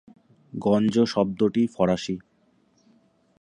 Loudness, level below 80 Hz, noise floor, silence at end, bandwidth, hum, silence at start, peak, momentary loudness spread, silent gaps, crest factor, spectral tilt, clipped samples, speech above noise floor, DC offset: -24 LUFS; -58 dBFS; -64 dBFS; 1.25 s; 10 kHz; none; 0.55 s; -8 dBFS; 12 LU; none; 18 dB; -7 dB/octave; under 0.1%; 42 dB; under 0.1%